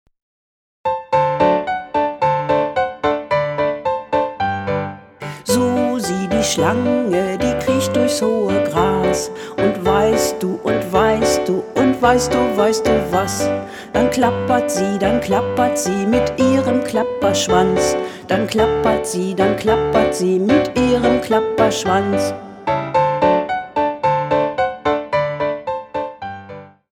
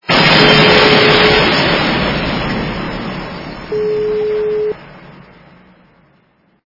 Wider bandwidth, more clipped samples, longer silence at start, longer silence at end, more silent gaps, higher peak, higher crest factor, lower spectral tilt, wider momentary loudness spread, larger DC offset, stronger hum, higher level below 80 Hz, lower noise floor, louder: first, 19 kHz vs 6 kHz; second, under 0.1% vs 0.2%; first, 0.85 s vs 0.1 s; second, 0.25 s vs 1.55 s; neither; about the same, 0 dBFS vs 0 dBFS; about the same, 16 dB vs 14 dB; about the same, -5 dB/octave vs -5.5 dB/octave; second, 7 LU vs 16 LU; neither; neither; second, -42 dBFS vs -34 dBFS; second, -37 dBFS vs -55 dBFS; second, -17 LUFS vs -11 LUFS